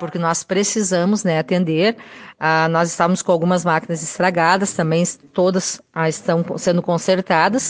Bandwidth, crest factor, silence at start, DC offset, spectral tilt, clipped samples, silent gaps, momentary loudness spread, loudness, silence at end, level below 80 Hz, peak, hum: 10 kHz; 16 dB; 0 s; under 0.1%; -4.5 dB/octave; under 0.1%; none; 6 LU; -18 LUFS; 0 s; -62 dBFS; -2 dBFS; none